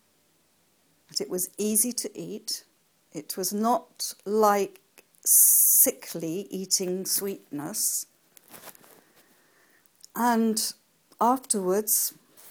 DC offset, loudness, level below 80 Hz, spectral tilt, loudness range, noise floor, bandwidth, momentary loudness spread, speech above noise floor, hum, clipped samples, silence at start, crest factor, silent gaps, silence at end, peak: under 0.1%; -24 LUFS; -78 dBFS; -2 dB/octave; 10 LU; -67 dBFS; 19.5 kHz; 18 LU; 41 dB; none; under 0.1%; 1.15 s; 24 dB; none; 0 s; -4 dBFS